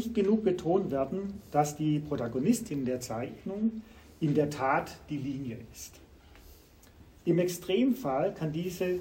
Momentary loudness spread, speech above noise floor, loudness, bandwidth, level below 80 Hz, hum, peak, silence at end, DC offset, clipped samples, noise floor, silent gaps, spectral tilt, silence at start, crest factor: 10 LU; 26 dB; -31 LUFS; 16 kHz; -58 dBFS; none; -14 dBFS; 0 s; under 0.1%; under 0.1%; -56 dBFS; none; -6.5 dB/octave; 0 s; 18 dB